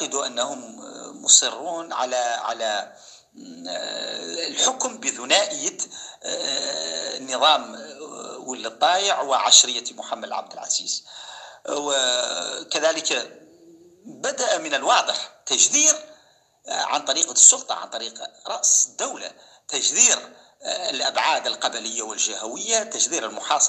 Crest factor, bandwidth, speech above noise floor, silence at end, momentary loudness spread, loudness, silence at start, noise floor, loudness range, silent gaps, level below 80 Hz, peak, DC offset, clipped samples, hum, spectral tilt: 24 dB; 14.5 kHz; 35 dB; 0 s; 19 LU; -20 LUFS; 0 s; -58 dBFS; 7 LU; none; -82 dBFS; 0 dBFS; under 0.1%; under 0.1%; none; 1.5 dB/octave